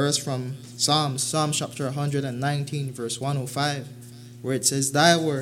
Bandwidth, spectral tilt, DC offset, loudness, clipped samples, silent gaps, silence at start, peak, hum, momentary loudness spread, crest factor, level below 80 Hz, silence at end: 16.5 kHz; -3.5 dB/octave; under 0.1%; -24 LUFS; under 0.1%; none; 0 s; -4 dBFS; none; 15 LU; 22 dB; -66 dBFS; 0 s